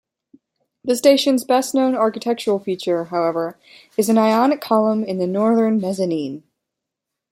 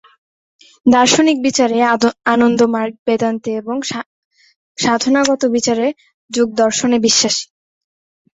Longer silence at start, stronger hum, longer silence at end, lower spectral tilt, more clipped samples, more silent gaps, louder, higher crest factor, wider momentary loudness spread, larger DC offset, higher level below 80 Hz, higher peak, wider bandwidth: about the same, 0.85 s vs 0.85 s; neither; about the same, 0.9 s vs 0.95 s; first, -5 dB/octave vs -3 dB/octave; neither; second, none vs 2.99-3.06 s, 4.06-4.31 s, 4.56-4.75 s, 6.14-6.29 s; second, -19 LUFS vs -15 LUFS; about the same, 16 dB vs 16 dB; about the same, 11 LU vs 10 LU; neither; second, -70 dBFS vs -56 dBFS; about the same, -2 dBFS vs 0 dBFS; first, 16.5 kHz vs 8.2 kHz